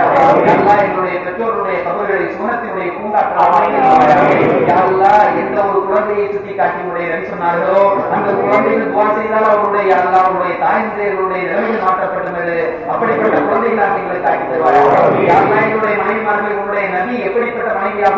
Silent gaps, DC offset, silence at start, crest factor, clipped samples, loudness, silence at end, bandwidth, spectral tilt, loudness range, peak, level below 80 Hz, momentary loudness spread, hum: none; under 0.1%; 0 s; 12 dB; under 0.1%; -13 LUFS; 0 s; 7.6 kHz; -7.5 dB/octave; 4 LU; 0 dBFS; -50 dBFS; 8 LU; none